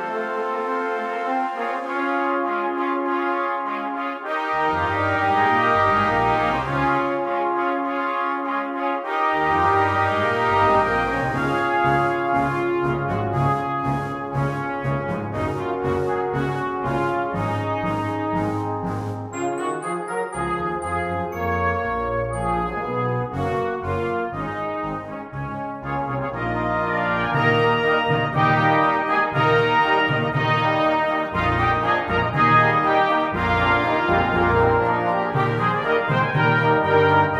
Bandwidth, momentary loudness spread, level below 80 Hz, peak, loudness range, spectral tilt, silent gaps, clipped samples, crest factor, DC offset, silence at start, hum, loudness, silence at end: 14 kHz; 8 LU; -44 dBFS; -4 dBFS; 6 LU; -6.5 dB/octave; none; under 0.1%; 18 dB; under 0.1%; 0 s; none; -21 LUFS; 0 s